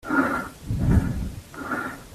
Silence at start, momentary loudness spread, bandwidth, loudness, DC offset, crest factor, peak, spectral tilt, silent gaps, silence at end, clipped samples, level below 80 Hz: 0.05 s; 11 LU; 14.5 kHz; -26 LUFS; under 0.1%; 18 dB; -8 dBFS; -7.5 dB/octave; none; 0 s; under 0.1%; -34 dBFS